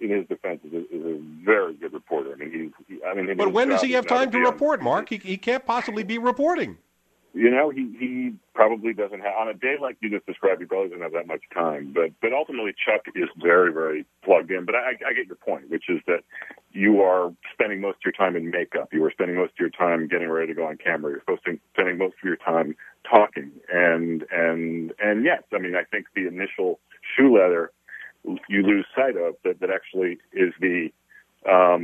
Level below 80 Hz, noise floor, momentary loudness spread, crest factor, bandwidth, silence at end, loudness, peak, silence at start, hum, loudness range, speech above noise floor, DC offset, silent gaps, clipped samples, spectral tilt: -74 dBFS; -59 dBFS; 12 LU; 24 dB; 8.6 kHz; 0 s; -23 LUFS; 0 dBFS; 0 s; none; 3 LU; 36 dB; under 0.1%; none; under 0.1%; -6 dB/octave